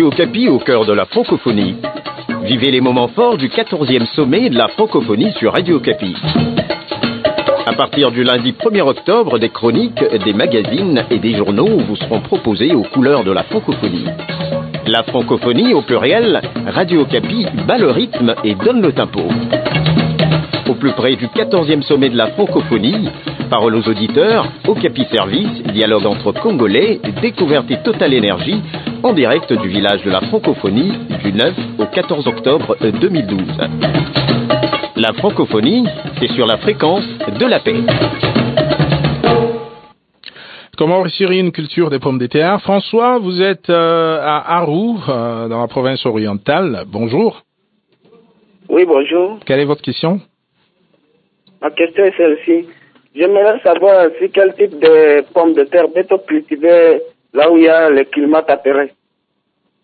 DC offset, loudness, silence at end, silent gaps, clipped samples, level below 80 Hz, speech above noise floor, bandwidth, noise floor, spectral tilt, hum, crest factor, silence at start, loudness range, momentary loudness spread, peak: under 0.1%; -13 LUFS; 0.95 s; none; under 0.1%; -46 dBFS; 54 dB; 4.8 kHz; -67 dBFS; -9 dB/octave; none; 14 dB; 0 s; 5 LU; 7 LU; 0 dBFS